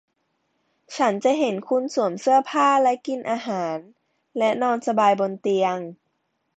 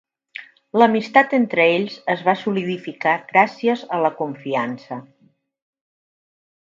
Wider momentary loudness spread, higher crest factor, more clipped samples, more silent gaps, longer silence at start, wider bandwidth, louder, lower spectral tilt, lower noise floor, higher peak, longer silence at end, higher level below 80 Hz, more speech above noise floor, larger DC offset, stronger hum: second, 11 LU vs 18 LU; about the same, 16 dB vs 20 dB; neither; neither; first, 0.9 s vs 0.4 s; first, 9 kHz vs 7.6 kHz; second, -22 LUFS vs -19 LUFS; second, -5 dB/octave vs -6.5 dB/octave; first, -73 dBFS vs -41 dBFS; second, -6 dBFS vs 0 dBFS; second, 0.65 s vs 1.65 s; about the same, -72 dBFS vs -72 dBFS; first, 52 dB vs 22 dB; neither; neither